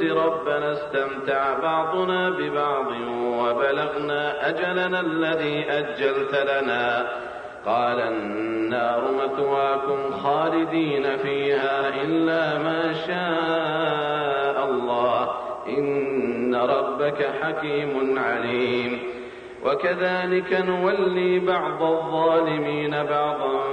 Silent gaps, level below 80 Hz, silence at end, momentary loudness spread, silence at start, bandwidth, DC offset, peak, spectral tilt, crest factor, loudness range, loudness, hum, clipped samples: none; -62 dBFS; 0 s; 4 LU; 0 s; 9.2 kHz; under 0.1%; -10 dBFS; -6.5 dB/octave; 14 dB; 2 LU; -23 LUFS; none; under 0.1%